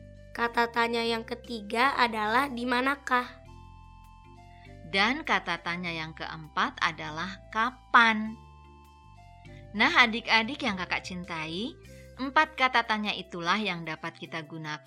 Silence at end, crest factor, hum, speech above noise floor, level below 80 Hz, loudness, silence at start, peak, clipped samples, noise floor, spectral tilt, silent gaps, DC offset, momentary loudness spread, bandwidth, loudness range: 0.1 s; 26 dB; none; 24 dB; -56 dBFS; -27 LUFS; 0 s; -4 dBFS; under 0.1%; -53 dBFS; -4 dB/octave; none; under 0.1%; 15 LU; 15.5 kHz; 4 LU